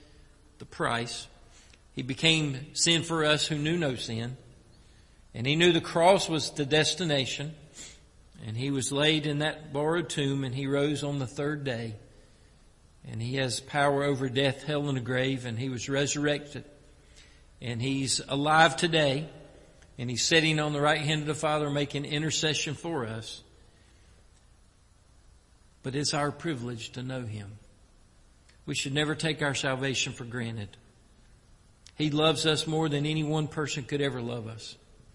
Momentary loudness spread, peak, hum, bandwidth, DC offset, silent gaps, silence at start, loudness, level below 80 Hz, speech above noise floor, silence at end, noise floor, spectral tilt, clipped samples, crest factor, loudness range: 17 LU; -6 dBFS; none; 11.5 kHz; under 0.1%; none; 0.6 s; -28 LUFS; -58 dBFS; 31 dB; 0.4 s; -60 dBFS; -4 dB/octave; under 0.1%; 24 dB; 8 LU